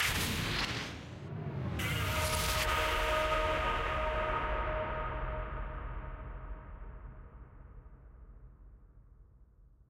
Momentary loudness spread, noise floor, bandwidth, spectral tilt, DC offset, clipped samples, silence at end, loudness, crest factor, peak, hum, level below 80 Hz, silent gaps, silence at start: 20 LU; -61 dBFS; 16 kHz; -3.5 dB/octave; under 0.1%; under 0.1%; 0.25 s; -34 LUFS; 18 dB; -18 dBFS; none; -42 dBFS; none; 0 s